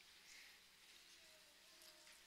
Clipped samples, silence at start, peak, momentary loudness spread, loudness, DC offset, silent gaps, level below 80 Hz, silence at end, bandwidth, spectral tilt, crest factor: under 0.1%; 0 s; -46 dBFS; 4 LU; -63 LUFS; under 0.1%; none; -90 dBFS; 0 s; 16 kHz; 0.5 dB/octave; 18 dB